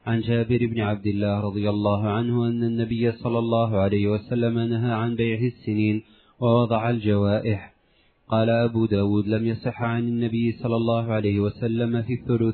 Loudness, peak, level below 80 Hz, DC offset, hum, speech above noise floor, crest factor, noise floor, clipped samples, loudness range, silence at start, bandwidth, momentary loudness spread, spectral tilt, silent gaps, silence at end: -24 LUFS; -8 dBFS; -54 dBFS; under 0.1%; none; 39 dB; 16 dB; -62 dBFS; under 0.1%; 1 LU; 0.05 s; 4.5 kHz; 4 LU; -11.5 dB/octave; none; 0 s